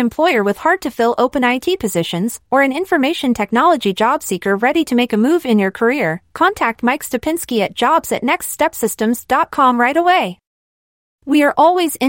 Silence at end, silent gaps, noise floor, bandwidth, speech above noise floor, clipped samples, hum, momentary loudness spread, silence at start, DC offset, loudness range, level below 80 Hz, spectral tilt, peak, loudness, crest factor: 0 s; 10.47-11.19 s; under -90 dBFS; 17 kHz; over 75 dB; under 0.1%; none; 6 LU; 0 s; under 0.1%; 2 LU; -52 dBFS; -4 dB/octave; -2 dBFS; -15 LUFS; 14 dB